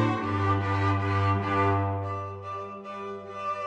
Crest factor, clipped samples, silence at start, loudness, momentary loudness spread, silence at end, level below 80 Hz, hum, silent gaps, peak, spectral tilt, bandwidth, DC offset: 16 dB; under 0.1%; 0 s; -28 LUFS; 12 LU; 0 s; -58 dBFS; none; none; -12 dBFS; -8 dB/octave; 7.8 kHz; under 0.1%